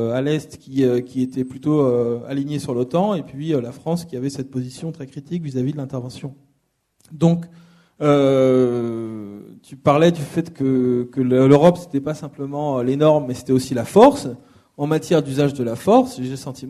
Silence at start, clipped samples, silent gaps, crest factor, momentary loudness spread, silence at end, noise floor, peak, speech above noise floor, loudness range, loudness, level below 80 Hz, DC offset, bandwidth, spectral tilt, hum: 0 s; under 0.1%; none; 20 dB; 15 LU; 0 s; -67 dBFS; 0 dBFS; 48 dB; 8 LU; -19 LUFS; -56 dBFS; under 0.1%; 13.5 kHz; -7.5 dB/octave; none